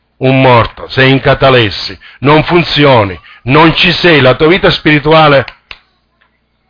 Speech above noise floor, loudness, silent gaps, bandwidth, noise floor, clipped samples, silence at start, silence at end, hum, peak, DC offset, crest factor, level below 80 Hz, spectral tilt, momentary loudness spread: 47 dB; -7 LUFS; none; 5.4 kHz; -55 dBFS; 0.4%; 0.2 s; 1.2 s; 60 Hz at -35 dBFS; 0 dBFS; under 0.1%; 8 dB; -32 dBFS; -7 dB/octave; 9 LU